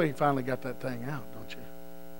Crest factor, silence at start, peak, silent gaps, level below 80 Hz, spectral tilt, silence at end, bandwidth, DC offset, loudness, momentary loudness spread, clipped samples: 20 dB; 0 s; -12 dBFS; none; -62 dBFS; -7 dB/octave; 0 s; 16 kHz; 1%; -32 LUFS; 18 LU; under 0.1%